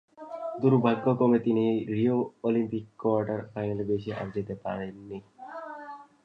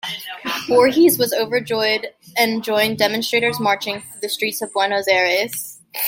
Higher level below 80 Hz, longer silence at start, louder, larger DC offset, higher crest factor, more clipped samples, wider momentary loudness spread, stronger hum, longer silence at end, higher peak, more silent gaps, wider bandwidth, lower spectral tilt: about the same, -64 dBFS vs -64 dBFS; first, 0.2 s vs 0.05 s; second, -28 LUFS vs -18 LUFS; neither; about the same, 20 dB vs 18 dB; neither; first, 19 LU vs 11 LU; neither; first, 0.2 s vs 0 s; second, -10 dBFS vs -2 dBFS; neither; second, 5.2 kHz vs 16.5 kHz; first, -10 dB/octave vs -3 dB/octave